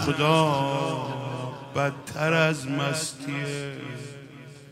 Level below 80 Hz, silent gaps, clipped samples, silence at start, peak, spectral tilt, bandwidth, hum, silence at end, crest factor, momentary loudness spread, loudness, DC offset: -64 dBFS; none; under 0.1%; 0 s; -6 dBFS; -5 dB/octave; 15.5 kHz; none; 0 s; 20 dB; 17 LU; -26 LUFS; under 0.1%